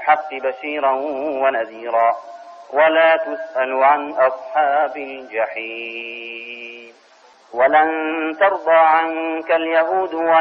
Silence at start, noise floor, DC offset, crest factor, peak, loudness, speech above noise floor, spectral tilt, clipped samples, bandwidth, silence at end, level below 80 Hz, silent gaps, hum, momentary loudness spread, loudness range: 0 s; -50 dBFS; under 0.1%; 16 dB; -4 dBFS; -18 LUFS; 32 dB; -5 dB/octave; under 0.1%; 5.8 kHz; 0 s; -66 dBFS; none; none; 15 LU; 5 LU